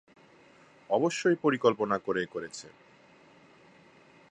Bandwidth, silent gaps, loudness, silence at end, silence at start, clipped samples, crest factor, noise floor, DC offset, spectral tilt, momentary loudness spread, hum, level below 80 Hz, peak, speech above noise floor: 11 kHz; none; -29 LUFS; 1.6 s; 0.9 s; under 0.1%; 22 dB; -58 dBFS; under 0.1%; -5 dB/octave; 16 LU; none; -74 dBFS; -10 dBFS; 30 dB